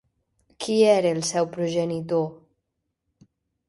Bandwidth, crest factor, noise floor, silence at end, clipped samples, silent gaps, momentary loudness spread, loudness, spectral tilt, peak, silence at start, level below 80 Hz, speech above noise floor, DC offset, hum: 11.5 kHz; 18 dB; -79 dBFS; 1.35 s; under 0.1%; none; 9 LU; -23 LUFS; -5 dB/octave; -6 dBFS; 0.6 s; -66 dBFS; 57 dB; under 0.1%; none